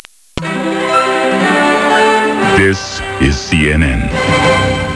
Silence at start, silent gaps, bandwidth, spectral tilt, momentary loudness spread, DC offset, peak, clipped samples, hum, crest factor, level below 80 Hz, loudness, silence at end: 0.35 s; none; 11 kHz; -5 dB/octave; 8 LU; under 0.1%; 0 dBFS; under 0.1%; none; 12 dB; -26 dBFS; -12 LUFS; 0 s